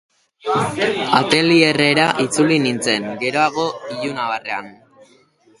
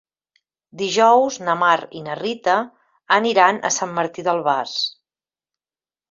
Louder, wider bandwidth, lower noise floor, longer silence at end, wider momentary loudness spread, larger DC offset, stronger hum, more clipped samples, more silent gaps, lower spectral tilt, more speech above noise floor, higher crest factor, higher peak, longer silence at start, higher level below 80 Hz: about the same, -17 LUFS vs -19 LUFS; first, 11.5 kHz vs 7.8 kHz; second, -54 dBFS vs under -90 dBFS; second, 0.85 s vs 1.2 s; about the same, 11 LU vs 12 LU; neither; neither; neither; neither; first, -4 dB/octave vs -2.5 dB/octave; second, 36 dB vs over 71 dB; about the same, 18 dB vs 18 dB; about the same, 0 dBFS vs -2 dBFS; second, 0.45 s vs 0.75 s; first, -58 dBFS vs -70 dBFS